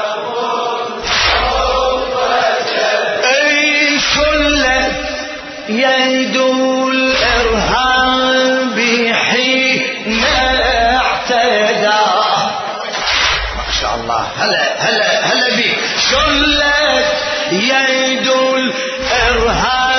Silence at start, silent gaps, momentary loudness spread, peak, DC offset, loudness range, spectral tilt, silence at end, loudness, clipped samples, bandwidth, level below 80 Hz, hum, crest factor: 0 s; none; 7 LU; 0 dBFS; under 0.1%; 2 LU; -2.5 dB/octave; 0 s; -12 LUFS; under 0.1%; 6.6 kHz; -32 dBFS; none; 14 dB